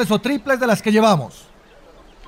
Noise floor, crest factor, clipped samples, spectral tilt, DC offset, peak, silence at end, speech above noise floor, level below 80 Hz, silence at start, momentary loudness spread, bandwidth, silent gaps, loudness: -46 dBFS; 16 dB; under 0.1%; -5.5 dB/octave; under 0.1%; -4 dBFS; 0 s; 29 dB; -52 dBFS; 0 s; 6 LU; 16 kHz; none; -17 LUFS